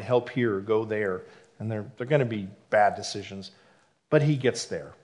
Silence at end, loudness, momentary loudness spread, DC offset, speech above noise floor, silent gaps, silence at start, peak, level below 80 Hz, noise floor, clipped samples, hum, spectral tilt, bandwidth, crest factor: 0.1 s; -27 LUFS; 14 LU; under 0.1%; 32 dB; none; 0 s; -6 dBFS; -72 dBFS; -59 dBFS; under 0.1%; none; -6 dB/octave; 11 kHz; 20 dB